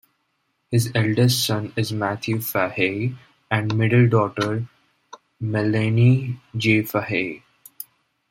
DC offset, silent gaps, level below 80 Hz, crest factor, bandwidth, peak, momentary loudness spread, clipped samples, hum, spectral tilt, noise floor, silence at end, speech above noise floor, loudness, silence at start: under 0.1%; none; -58 dBFS; 18 dB; 16.5 kHz; -4 dBFS; 13 LU; under 0.1%; none; -6 dB/octave; -71 dBFS; 0.45 s; 51 dB; -21 LUFS; 0.7 s